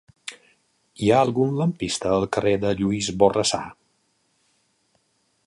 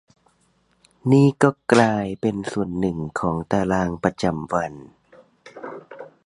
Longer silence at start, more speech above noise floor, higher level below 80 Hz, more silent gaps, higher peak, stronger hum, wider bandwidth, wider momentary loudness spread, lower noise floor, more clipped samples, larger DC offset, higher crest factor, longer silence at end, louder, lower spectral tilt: second, 0.25 s vs 1.05 s; first, 47 dB vs 43 dB; about the same, -52 dBFS vs -50 dBFS; neither; about the same, -2 dBFS vs 0 dBFS; neither; about the same, 11.5 kHz vs 11.5 kHz; about the same, 18 LU vs 20 LU; first, -68 dBFS vs -64 dBFS; neither; neither; about the same, 22 dB vs 22 dB; first, 1.75 s vs 0.2 s; about the same, -22 LUFS vs -21 LUFS; second, -5 dB/octave vs -7 dB/octave